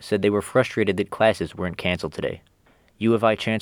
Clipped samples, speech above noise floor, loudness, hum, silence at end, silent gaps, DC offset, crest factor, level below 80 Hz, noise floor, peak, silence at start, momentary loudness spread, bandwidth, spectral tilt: under 0.1%; 37 dB; -23 LUFS; none; 0 s; none; under 0.1%; 20 dB; -54 dBFS; -59 dBFS; -2 dBFS; 0 s; 9 LU; 18.5 kHz; -6 dB/octave